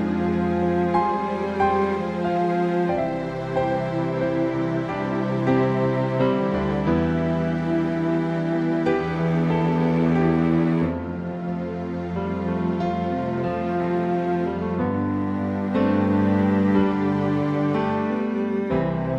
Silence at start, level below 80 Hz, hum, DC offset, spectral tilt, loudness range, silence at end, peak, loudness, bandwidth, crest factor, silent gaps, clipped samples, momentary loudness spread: 0 s; -46 dBFS; none; 0.1%; -9 dB/octave; 3 LU; 0 s; -8 dBFS; -23 LUFS; 7.8 kHz; 14 dB; none; under 0.1%; 6 LU